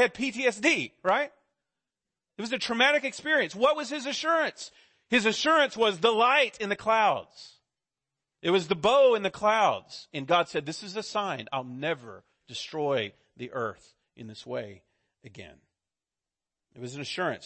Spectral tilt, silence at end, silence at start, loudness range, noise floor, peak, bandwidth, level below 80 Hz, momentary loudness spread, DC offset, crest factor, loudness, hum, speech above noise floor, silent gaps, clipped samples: -3.5 dB/octave; 0 s; 0 s; 13 LU; under -90 dBFS; -10 dBFS; 8.8 kHz; -70 dBFS; 16 LU; under 0.1%; 18 dB; -26 LUFS; none; over 63 dB; none; under 0.1%